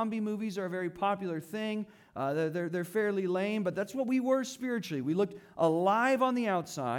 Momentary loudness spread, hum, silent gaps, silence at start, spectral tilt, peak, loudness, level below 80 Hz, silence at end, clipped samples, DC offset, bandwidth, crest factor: 9 LU; none; none; 0 s; -6 dB/octave; -16 dBFS; -32 LUFS; -76 dBFS; 0 s; under 0.1%; under 0.1%; 18 kHz; 16 dB